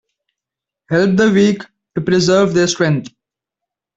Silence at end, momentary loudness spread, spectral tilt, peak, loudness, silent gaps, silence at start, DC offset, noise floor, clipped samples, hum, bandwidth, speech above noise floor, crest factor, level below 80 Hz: 0.9 s; 10 LU; -5.5 dB/octave; -2 dBFS; -14 LUFS; none; 0.9 s; under 0.1%; -85 dBFS; under 0.1%; none; 8.2 kHz; 71 dB; 14 dB; -52 dBFS